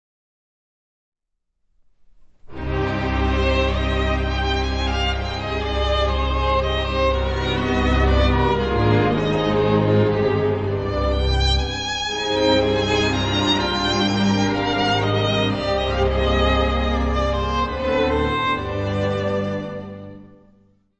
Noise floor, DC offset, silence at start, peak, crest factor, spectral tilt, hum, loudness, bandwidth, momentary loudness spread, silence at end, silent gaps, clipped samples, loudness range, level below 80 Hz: -72 dBFS; under 0.1%; 2.2 s; -4 dBFS; 16 dB; -6 dB/octave; none; -20 LUFS; 8.4 kHz; 6 LU; 0.75 s; none; under 0.1%; 4 LU; -28 dBFS